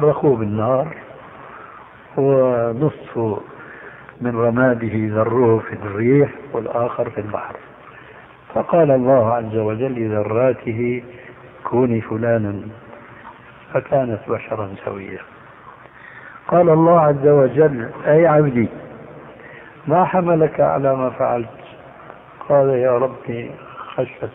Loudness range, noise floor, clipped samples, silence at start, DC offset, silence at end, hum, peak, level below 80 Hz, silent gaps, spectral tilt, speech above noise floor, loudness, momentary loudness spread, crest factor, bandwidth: 8 LU; -42 dBFS; under 0.1%; 0 s; under 0.1%; 0.05 s; none; -2 dBFS; -54 dBFS; none; -12 dB/octave; 25 dB; -18 LUFS; 24 LU; 16 dB; 3.7 kHz